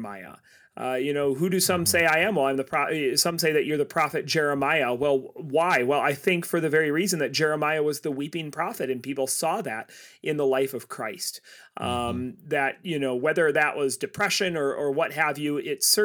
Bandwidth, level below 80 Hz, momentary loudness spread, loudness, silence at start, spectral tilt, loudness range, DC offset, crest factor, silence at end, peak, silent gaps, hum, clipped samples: over 20 kHz; -64 dBFS; 10 LU; -25 LUFS; 0 s; -3.5 dB/octave; 6 LU; under 0.1%; 18 dB; 0 s; -8 dBFS; none; none; under 0.1%